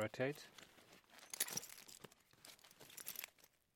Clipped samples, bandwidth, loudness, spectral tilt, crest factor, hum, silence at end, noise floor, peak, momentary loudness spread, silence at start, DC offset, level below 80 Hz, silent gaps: under 0.1%; 17 kHz; -47 LUFS; -2.5 dB/octave; 28 dB; none; 0.3 s; -71 dBFS; -22 dBFS; 20 LU; 0 s; under 0.1%; -86 dBFS; none